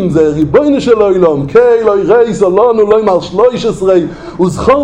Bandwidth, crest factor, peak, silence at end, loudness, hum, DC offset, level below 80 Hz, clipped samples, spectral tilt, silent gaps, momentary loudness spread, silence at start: 10 kHz; 8 dB; 0 dBFS; 0 s; -9 LUFS; none; under 0.1%; -36 dBFS; 0.3%; -7 dB/octave; none; 4 LU; 0 s